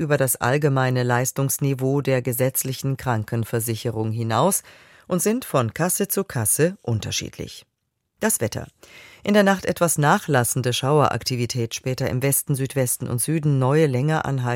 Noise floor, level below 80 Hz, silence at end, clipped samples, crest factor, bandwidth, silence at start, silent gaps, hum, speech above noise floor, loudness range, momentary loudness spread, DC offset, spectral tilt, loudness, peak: -75 dBFS; -54 dBFS; 0 s; under 0.1%; 18 dB; 17 kHz; 0 s; none; none; 54 dB; 3 LU; 7 LU; under 0.1%; -5 dB/octave; -21 LUFS; -2 dBFS